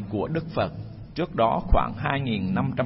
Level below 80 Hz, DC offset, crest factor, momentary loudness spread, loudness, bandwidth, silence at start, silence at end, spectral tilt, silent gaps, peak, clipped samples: -34 dBFS; under 0.1%; 18 dB; 8 LU; -26 LUFS; 5.8 kHz; 0 s; 0 s; -11 dB/octave; none; -6 dBFS; under 0.1%